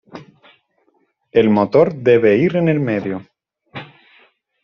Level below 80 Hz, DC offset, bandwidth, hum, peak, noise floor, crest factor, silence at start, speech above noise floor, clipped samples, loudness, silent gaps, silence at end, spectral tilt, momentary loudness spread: -58 dBFS; under 0.1%; 6.4 kHz; none; -2 dBFS; -63 dBFS; 16 dB; 0.15 s; 49 dB; under 0.1%; -15 LUFS; none; 0.8 s; -6.5 dB/octave; 22 LU